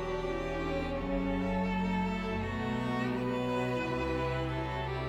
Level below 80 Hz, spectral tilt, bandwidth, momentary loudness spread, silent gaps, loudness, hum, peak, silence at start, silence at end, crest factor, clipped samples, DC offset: -44 dBFS; -7 dB/octave; 10.5 kHz; 3 LU; none; -33 LUFS; none; -20 dBFS; 0 s; 0 s; 12 dB; under 0.1%; under 0.1%